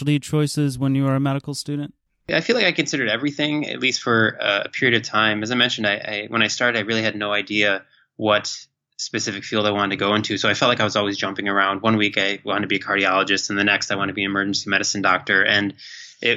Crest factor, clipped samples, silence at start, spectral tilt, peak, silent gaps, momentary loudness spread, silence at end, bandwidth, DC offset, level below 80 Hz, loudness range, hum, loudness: 18 dB; under 0.1%; 0 s; -4 dB/octave; -4 dBFS; none; 7 LU; 0 s; 13 kHz; under 0.1%; -62 dBFS; 2 LU; none; -20 LUFS